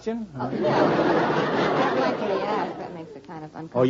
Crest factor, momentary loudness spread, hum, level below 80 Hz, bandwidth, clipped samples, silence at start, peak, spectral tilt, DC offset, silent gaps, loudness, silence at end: 16 dB; 17 LU; none; -60 dBFS; 7.6 kHz; under 0.1%; 0 s; -8 dBFS; -6.5 dB/octave; under 0.1%; none; -24 LUFS; 0 s